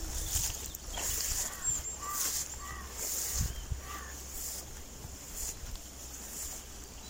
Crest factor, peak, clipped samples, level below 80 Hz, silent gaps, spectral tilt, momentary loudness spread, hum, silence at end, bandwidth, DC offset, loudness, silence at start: 22 dB; -18 dBFS; under 0.1%; -44 dBFS; none; -1.5 dB/octave; 13 LU; none; 0 s; 16.5 kHz; under 0.1%; -36 LUFS; 0 s